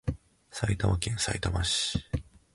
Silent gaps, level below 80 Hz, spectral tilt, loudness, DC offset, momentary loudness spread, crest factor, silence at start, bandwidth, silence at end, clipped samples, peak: none; -40 dBFS; -4 dB/octave; -30 LUFS; under 0.1%; 10 LU; 20 dB; 0.05 s; 11.5 kHz; 0.3 s; under 0.1%; -10 dBFS